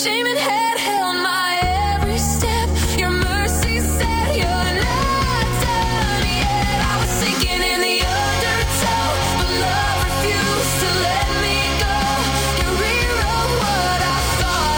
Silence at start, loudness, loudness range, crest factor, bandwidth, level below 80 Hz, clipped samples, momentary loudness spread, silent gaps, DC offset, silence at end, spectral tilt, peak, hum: 0 s; -18 LUFS; 1 LU; 12 dB; over 20 kHz; -26 dBFS; under 0.1%; 1 LU; none; under 0.1%; 0 s; -3.5 dB/octave; -6 dBFS; none